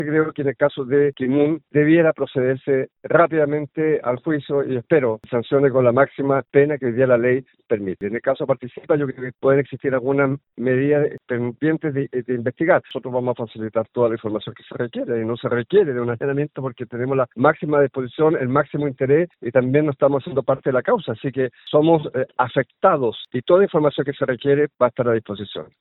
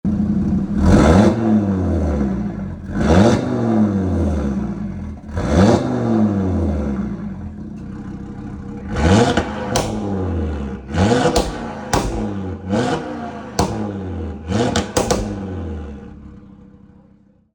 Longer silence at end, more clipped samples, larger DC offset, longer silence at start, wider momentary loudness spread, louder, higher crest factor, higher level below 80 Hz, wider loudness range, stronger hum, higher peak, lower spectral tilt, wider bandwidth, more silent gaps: second, 0.15 s vs 0.9 s; neither; neither; about the same, 0 s vs 0.05 s; second, 9 LU vs 17 LU; about the same, -20 LUFS vs -18 LUFS; about the same, 18 dB vs 18 dB; second, -62 dBFS vs -30 dBFS; about the same, 4 LU vs 6 LU; neither; about the same, 0 dBFS vs -2 dBFS; first, -11.5 dB/octave vs -6.5 dB/octave; second, 4.1 kHz vs 19.5 kHz; neither